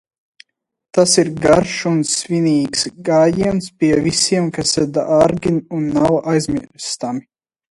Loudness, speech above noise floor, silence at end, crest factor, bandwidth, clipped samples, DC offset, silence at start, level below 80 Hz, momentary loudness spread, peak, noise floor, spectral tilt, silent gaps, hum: -16 LUFS; 34 dB; 0.55 s; 16 dB; 11.5 kHz; under 0.1%; under 0.1%; 0.95 s; -46 dBFS; 9 LU; 0 dBFS; -50 dBFS; -4.5 dB/octave; none; none